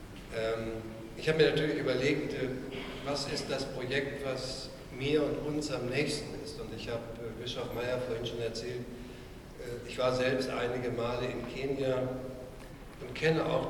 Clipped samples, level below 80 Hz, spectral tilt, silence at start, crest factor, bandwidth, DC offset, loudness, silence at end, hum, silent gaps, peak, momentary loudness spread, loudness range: under 0.1%; -52 dBFS; -5 dB/octave; 0 s; 20 dB; 19 kHz; under 0.1%; -34 LUFS; 0 s; none; none; -12 dBFS; 14 LU; 5 LU